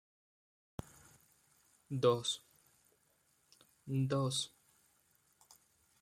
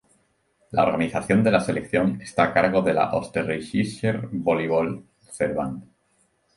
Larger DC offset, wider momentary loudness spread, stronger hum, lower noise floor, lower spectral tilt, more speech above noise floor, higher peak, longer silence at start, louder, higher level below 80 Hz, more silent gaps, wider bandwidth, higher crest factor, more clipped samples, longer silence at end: neither; first, 20 LU vs 9 LU; neither; first, -75 dBFS vs -66 dBFS; second, -5 dB/octave vs -6.5 dB/octave; second, 40 dB vs 44 dB; second, -18 dBFS vs -4 dBFS; first, 1.9 s vs 0.7 s; second, -36 LUFS vs -23 LUFS; second, -74 dBFS vs -54 dBFS; neither; first, 15.5 kHz vs 11.5 kHz; about the same, 24 dB vs 20 dB; neither; first, 1.55 s vs 0.75 s